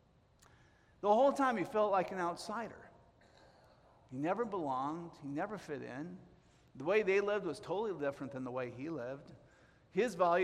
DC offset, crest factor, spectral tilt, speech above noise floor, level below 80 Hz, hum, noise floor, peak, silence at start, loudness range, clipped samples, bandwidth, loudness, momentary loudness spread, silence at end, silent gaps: under 0.1%; 20 dB; -6 dB/octave; 31 dB; -74 dBFS; none; -67 dBFS; -18 dBFS; 1 s; 6 LU; under 0.1%; 14 kHz; -36 LUFS; 15 LU; 0 s; none